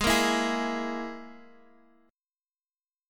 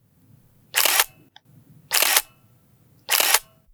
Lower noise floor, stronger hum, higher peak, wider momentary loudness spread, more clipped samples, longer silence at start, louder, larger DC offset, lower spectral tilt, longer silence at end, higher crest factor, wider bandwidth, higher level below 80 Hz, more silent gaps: first, under -90 dBFS vs -57 dBFS; neither; second, -10 dBFS vs 0 dBFS; first, 20 LU vs 7 LU; neither; second, 0 s vs 0.75 s; second, -28 LUFS vs -19 LUFS; neither; first, -3 dB/octave vs 2 dB/octave; first, 1.65 s vs 0.3 s; about the same, 20 dB vs 24 dB; second, 17.5 kHz vs over 20 kHz; first, -50 dBFS vs -64 dBFS; neither